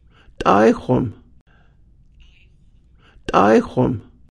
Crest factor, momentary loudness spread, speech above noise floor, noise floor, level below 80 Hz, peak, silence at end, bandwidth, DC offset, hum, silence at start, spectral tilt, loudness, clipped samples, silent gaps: 20 dB; 14 LU; 35 dB; -51 dBFS; -44 dBFS; 0 dBFS; 0.35 s; 10.5 kHz; under 0.1%; none; 0.4 s; -7 dB/octave; -17 LUFS; under 0.1%; 1.41-1.46 s